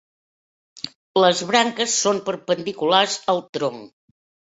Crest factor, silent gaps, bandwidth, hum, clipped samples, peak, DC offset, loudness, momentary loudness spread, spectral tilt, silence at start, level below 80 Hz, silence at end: 20 dB; 0.95-1.14 s, 3.49-3.53 s; 8.2 kHz; none; under 0.1%; -2 dBFS; under 0.1%; -20 LUFS; 15 LU; -2.5 dB/octave; 0.75 s; -68 dBFS; 0.65 s